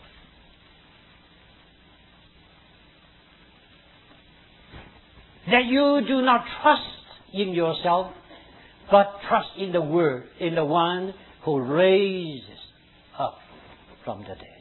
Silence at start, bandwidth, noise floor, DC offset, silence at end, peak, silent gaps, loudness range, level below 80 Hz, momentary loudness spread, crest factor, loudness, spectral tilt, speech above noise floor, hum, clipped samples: 4.75 s; 4.3 kHz; -55 dBFS; under 0.1%; 0.15 s; -4 dBFS; none; 4 LU; -58 dBFS; 18 LU; 22 dB; -23 LUFS; -9 dB/octave; 32 dB; none; under 0.1%